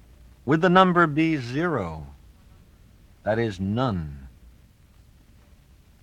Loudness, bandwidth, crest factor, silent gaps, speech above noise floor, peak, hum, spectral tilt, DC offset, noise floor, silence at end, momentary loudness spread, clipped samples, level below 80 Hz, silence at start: -23 LUFS; 9.8 kHz; 24 dB; none; 32 dB; -2 dBFS; none; -7.5 dB/octave; under 0.1%; -54 dBFS; 1.75 s; 21 LU; under 0.1%; -50 dBFS; 0.45 s